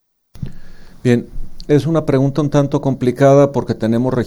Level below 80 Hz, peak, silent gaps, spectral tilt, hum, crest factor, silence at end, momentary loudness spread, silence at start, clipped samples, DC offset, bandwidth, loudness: -34 dBFS; 0 dBFS; none; -8 dB/octave; none; 14 dB; 0 s; 21 LU; 0.35 s; under 0.1%; under 0.1%; 12 kHz; -15 LUFS